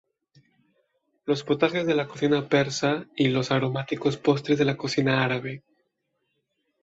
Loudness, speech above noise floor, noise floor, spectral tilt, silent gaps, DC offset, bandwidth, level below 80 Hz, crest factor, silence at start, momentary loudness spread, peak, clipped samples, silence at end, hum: -25 LUFS; 52 dB; -76 dBFS; -5.5 dB/octave; none; under 0.1%; 8 kHz; -64 dBFS; 20 dB; 1.25 s; 6 LU; -6 dBFS; under 0.1%; 1.25 s; none